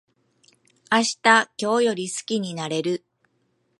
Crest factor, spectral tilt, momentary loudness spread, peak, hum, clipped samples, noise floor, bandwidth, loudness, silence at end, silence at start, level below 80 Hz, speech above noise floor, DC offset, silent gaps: 22 dB; -3 dB/octave; 11 LU; -2 dBFS; none; under 0.1%; -69 dBFS; 11.5 kHz; -22 LUFS; 0.8 s; 0.9 s; -76 dBFS; 47 dB; under 0.1%; none